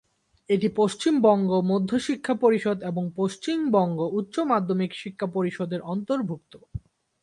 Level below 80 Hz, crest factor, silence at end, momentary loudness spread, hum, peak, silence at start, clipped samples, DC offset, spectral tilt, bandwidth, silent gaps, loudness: -58 dBFS; 18 dB; 0.45 s; 10 LU; none; -6 dBFS; 0.5 s; under 0.1%; under 0.1%; -6.5 dB/octave; 11.5 kHz; none; -25 LUFS